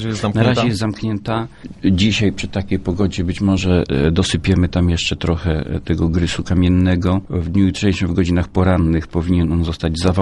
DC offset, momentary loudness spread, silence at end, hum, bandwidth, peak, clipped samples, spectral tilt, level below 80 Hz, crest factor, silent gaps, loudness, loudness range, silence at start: under 0.1%; 6 LU; 0 s; none; 11.5 kHz; 0 dBFS; under 0.1%; -6.5 dB/octave; -34 dBFS; 16 dB; none; -17 LUFS; 2 LU; 0 s